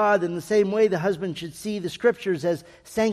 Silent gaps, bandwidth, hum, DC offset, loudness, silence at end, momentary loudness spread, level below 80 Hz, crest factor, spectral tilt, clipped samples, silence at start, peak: none; 14.5 kHz; none; under 0.1%; -24 LUFS; 0 s; 10 LU; -60 dBFS; 16 dB; -5.5 dB/octave; under 0.1%; 0 s; -8 dBFS